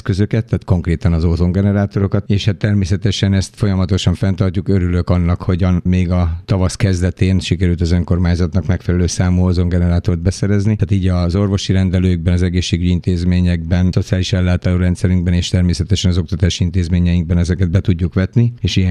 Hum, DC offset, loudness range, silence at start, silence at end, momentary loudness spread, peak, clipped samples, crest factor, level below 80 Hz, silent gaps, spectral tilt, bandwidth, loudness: none; under 0.1%; 1 LU; 0.05 s; 0 s; 2 LU; -2 dBFS; under 0.1%; 14 dB; -28 dBFS; none; -6.5 dB/octave; 10 kHz; -16 LUFS